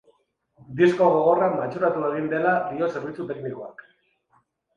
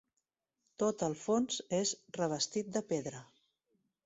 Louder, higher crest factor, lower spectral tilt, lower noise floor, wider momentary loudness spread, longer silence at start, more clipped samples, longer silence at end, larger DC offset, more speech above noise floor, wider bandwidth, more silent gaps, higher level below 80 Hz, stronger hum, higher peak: first, -23 LUFS vs -35 LUFS; about the same, 18 dB vs 18 dB; first, -7.5 dB/octave vs -4 dB/octave; second, -66 dBFS vs -87 dBFS; first, 15 LU vs 5 LU; about the same, 0.7 s vs 0.8 s; neither; first, 1.05 s vs 0.8 s; neither; second, 44 dB vs 52 dB; second, 7.4 kHz vs 8.2 kHz; neither; first, -66 dBFS vs -74 dBFS; neither; first, -6 dBFS vs -20 dBFS